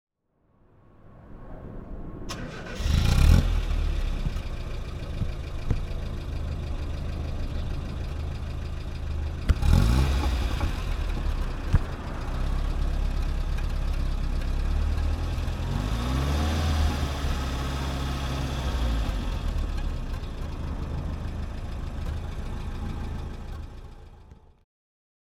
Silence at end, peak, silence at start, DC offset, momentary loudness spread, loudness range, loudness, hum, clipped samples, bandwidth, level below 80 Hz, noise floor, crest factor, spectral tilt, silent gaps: 0.95 s; -6 dBFS; 1.05 s; under 0.1%; 11 LU; 7 LU; -30 LUFS; none; under 0.1%; 14.5 kHz; -28 dBFS; -68 dBFS; 22 dB; -6 dB/octave; none